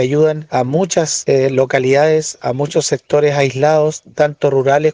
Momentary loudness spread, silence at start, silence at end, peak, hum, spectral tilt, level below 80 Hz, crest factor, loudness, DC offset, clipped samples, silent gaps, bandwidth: 5 LU; 0 s; 0 s; -2 dBFS; none; -5 dB/octave; -56 dBFS; 12 dB; -14 LUFS; under 0.1%; under 0.1%; none; 10 kHz